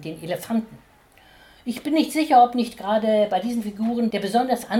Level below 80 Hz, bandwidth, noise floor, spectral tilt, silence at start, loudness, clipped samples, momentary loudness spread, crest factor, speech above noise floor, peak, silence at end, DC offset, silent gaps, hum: -60 dBFS; 18 kHz; -53 dBFS; -5 dB/octave; 0 s; -22 LUFS; under 0.1%; 14 LU; 18 dB; 31 dB; -4 dBFS; 0 s; under 0.1%; none; none